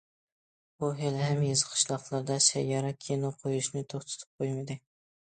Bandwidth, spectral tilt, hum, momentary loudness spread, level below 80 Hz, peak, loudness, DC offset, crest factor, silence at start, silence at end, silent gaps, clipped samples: 9.4 kHz; -4 dB/octave; none; 13 LU; -72 dBFS; -10 dBFS; -30 LUFS; under 0.1%; 22 dB; 0.8 s; 0.45 s; 4.27-4.39 s; under 0.1%